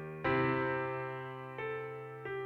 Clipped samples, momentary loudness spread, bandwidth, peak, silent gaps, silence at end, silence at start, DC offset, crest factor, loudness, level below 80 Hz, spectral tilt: under 0.1%; 12 LU; 5.8 kHz; -20 dBFS; none; 0 s; 0 s; under 0.1%; 16 dB; -36 LUFS; -64 dBFS; -8.5 dB/octave